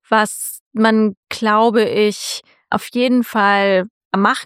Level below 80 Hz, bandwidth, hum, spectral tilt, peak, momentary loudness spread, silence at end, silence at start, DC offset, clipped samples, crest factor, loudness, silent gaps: -64 dBFS; 16 kHz; none; -4 dB/octave; 0 dBFS; 11 LU; 0 s; 0.1 s; under 0.1%; under 0.1%; 16 dB; -16 LUFS; 0.61-0.71 s, 1.17-1.23 s, 3.90-4.11 s